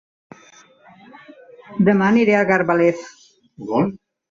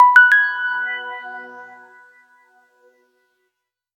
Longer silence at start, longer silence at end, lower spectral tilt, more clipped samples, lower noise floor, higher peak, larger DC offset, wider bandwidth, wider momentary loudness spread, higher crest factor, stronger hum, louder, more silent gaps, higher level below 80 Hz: first, 1.7 s vs 0 s; second, 0.35 s vs 2.35 s; first, -7.5 dB/octave vs 0.5 dB/octave; neither; second, -49 dBFS vs -77 dBFS; second, -4 dBFS vs 0 dBFS; neither; second, 7.6 kHz vs 10.5 kHz; second, 17 LU vs 26 LU; about the same, 16 dB vs 20 dB; neither; second, -17 LUFS vs -14 LUFS; neither; first, -60 dBFS vs -88 dBFS